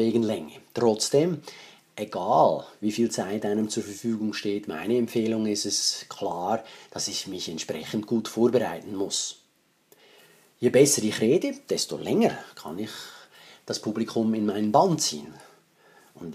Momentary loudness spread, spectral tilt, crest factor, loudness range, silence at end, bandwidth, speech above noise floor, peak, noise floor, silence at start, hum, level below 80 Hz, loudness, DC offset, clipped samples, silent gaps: 15 LU; -4 dB/octave; 22 dB; 4 LU; 0 s; 15.5 kHz; 40 dB; -4 dBFS; -66 dBFS; 0 s; none; -72 dBFS; -26 LUFS; under 0.1%; under 0.1%; none